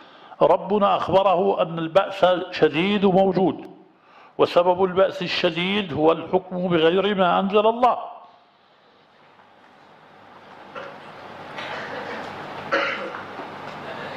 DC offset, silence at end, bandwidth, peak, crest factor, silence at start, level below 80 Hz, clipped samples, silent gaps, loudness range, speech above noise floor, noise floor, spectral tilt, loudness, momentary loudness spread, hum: under 0.1%; 0 s; 8.6 kHz; -4 dBFS; 18 dB; 0.25 s; -60 dBFS; under 0.1%; none; 16 LU; 36 dB; -56 dBFS; -6.5 dB/octave; -21 LUFS; 17 LU; none